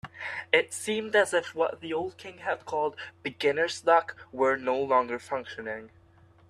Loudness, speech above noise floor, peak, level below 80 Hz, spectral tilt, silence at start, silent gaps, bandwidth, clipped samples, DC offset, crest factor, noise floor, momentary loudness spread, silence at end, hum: -28 LUFS; 30 dB; -6 dBFS; -70 dBFS; -3 dB/octave; 0.05 s; none; 13 kHz; under 0.1%; under 0.1%; 22 dB; -58 dBFS; 13 LU; 0.6 s; none